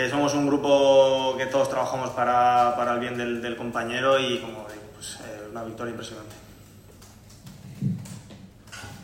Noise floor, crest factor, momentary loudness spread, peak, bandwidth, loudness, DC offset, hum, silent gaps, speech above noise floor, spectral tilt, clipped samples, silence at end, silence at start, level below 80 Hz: -48 dBFS; 18 dB; 22 LU; -8 dBFS; 16 kHz; -23 LUFS; under 0.1%; none; none; 24 dB; -4.5 dB/octave; under 0.1%; 0 s; 0 s; -58 dBFS